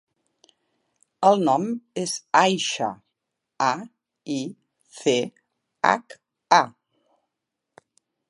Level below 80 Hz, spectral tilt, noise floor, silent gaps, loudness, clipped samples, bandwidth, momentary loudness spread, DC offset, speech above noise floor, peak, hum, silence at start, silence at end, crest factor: -78 dBFS; -3.5 dB/octave; -83 dBFS; none; -23 LUFS; under 0.1%; 11.5 kHz; 14 LU; under 0.1%; 61 dB; -2 dBFS; none; 1.2 s; 1.6 s; 24 dB